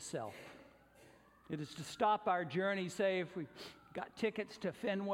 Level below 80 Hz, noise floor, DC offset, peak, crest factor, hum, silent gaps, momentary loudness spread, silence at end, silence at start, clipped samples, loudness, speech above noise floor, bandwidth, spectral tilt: -76 dBFS; -64 dBFS; under 0.1%; -20 dBFS; 20 dB; none; none; 14 LU; 0 s; 0 s; under 0.1%; -39 LUFS; 25 dB; 16.5 kHz; -5 dB/octave